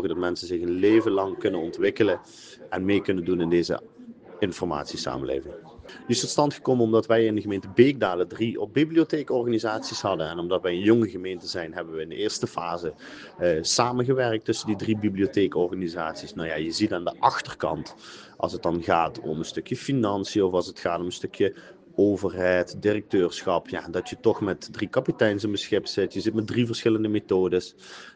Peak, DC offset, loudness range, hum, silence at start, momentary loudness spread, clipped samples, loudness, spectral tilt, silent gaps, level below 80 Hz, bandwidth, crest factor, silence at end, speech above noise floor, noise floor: -4 dBFS; under 0.1%; 4 LU; none; 0 s; 11 LU; under 0.1%; -25 LUFS; -5 dB/octave; none; -60 dBFS; 9.8 kHz; 22 dB; 0.05 s; 20 dB; -45 dBFS